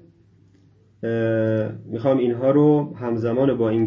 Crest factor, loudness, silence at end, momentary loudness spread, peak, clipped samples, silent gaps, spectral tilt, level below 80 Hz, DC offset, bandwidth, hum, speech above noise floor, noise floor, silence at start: 14 dB; -21 LUFS; 0 s; 9 LU; -6 dBFS; under 0.1%; none; -10.5 dB/octave; -58 dBFS; under 0.1%; 6.6 kHz; none; 35 dB; -55 dBFS; 1 s